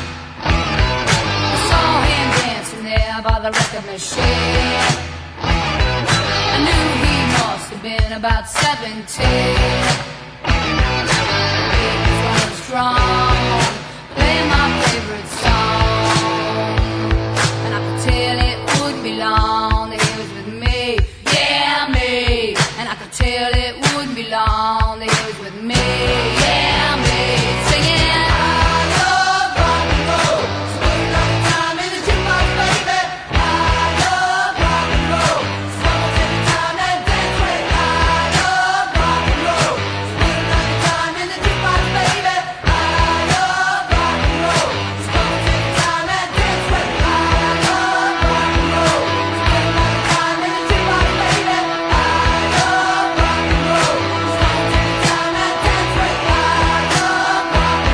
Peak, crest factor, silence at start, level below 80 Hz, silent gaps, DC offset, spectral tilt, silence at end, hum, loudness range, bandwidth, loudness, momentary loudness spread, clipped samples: 0 dBFS; 16 dB; 0 s; -24 dBFS; none; under 0.1%; -4 dB/octave; 0 s; none; 2 LU; 11 kHz; -16 LUFS; 5 LU; under 0.1%